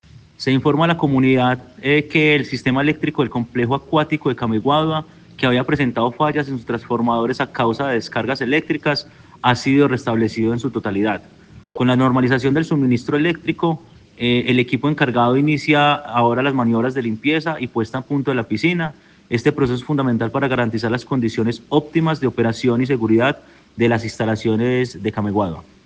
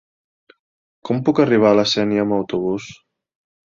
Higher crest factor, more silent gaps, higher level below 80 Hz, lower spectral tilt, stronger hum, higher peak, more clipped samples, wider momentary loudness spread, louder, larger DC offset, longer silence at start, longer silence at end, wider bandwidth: about the same, 16 dB vs 18 dB; neither; first, -52 dBFS vs -58 dBFS; about the same, -7 dB/octave vs -6 dB/octave; neither; about the same, -2 dBFS vs -2 dBFS; neither; second, 7 LU vs 14 LU; about the same, -18 LUFS vs -18 LUFS; neither; second, 0.15 s vs 1.05 s; second, 0.25 s vs 0.85 s; first, 9 kHz vs 7.6 kHz